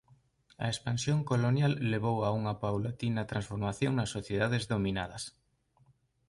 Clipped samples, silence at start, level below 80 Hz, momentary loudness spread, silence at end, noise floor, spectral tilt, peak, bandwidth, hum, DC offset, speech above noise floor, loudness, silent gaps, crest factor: under 0.1%; 0.6 s; -56 dBFS; 7 LU; 1 s; -68 dBFS; -6 dB/octave; -16 dBFS; 11.5 kHz; none; under 0.1%; 36 dB; -32 LUFS; none; 16 dB